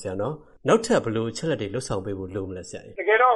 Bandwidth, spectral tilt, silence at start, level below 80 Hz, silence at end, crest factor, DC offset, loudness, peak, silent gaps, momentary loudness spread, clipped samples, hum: 11.5 kHz; -5 dB/octave; 0 s; -52 dBFS; 0 s; 18 dB; under 0.1%; -25 LUFS; -6 dBFS; none; 12 LU; under 0.1%; none